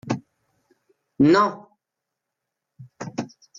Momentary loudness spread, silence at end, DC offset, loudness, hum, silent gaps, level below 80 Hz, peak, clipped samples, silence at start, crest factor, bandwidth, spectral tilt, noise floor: 20 LU; 0.35 s; under 0.1%; -22 LUFS; none; none; -64 dBFS; -8 dBFS; under 0.1%; 0.05 s; 18 dB; 7.6 kHz; -6.5 dB/octave; -84 dBFS